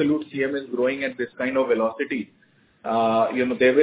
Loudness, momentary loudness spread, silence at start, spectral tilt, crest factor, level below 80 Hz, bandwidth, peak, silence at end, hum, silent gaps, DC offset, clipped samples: -23 LUFS; 8 LU; 0 s; -9.5 dB/octave; 16 dB; -62 dBFS; 4 kHz; -6 dBFS; 0 s; none; none; under 0.1%; under 0.1%